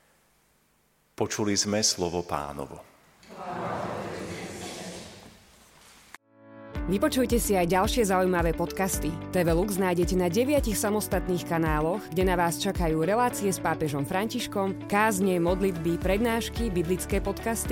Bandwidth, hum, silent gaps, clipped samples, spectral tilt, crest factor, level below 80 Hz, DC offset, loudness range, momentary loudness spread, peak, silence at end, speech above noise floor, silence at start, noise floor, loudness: 17 kHz; none; none; under 0.1%; -4.5 dB/octave; 18 dB; -40 dBFS; under 0.1%; 12 LU; 13 LU; -10 dBFS; 0 s; 41 dB; 1.2 s; -67 dBFS; -27 LUFS